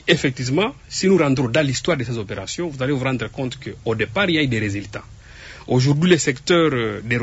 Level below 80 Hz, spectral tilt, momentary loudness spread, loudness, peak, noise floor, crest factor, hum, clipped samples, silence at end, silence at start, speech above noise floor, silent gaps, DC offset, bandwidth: -46 dBFS; -5 dB/octave; 12 LU; -20 LUFS; -2 dBFS; -40 dBFS; 18 dB; none; under 0.1%; 0 s; 0.05 s; 20 dB; none; under 0.1%; 8 kHz